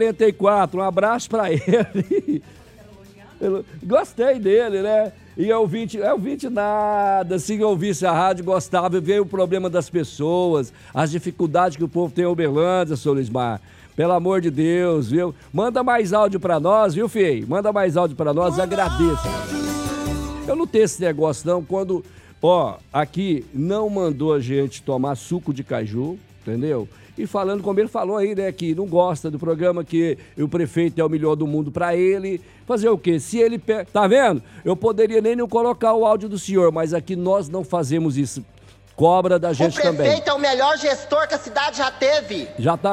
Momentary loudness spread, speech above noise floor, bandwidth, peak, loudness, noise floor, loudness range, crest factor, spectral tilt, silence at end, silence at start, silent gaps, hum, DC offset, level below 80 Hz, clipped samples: 8 LU; 25 dB; 15.5 kHz; -2 dBFS; -20 LUFS; -45 dBFS; 4 LU; 18 dB; -6 dB/octave; 0 s; 0 s; none; none; under 0.1%; -46 dBFS; under 0.1%